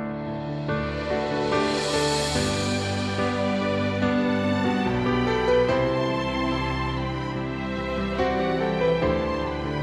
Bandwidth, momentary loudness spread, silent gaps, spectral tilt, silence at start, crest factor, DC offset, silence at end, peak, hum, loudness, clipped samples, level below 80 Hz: 13 kHz; 6 LU; none; -5.5 dB/octave; 0 s; 14 dB; under 0.1%; 0 s; -10 dBFS; none; -25 LUFS; under 0.1%; -40 dBFS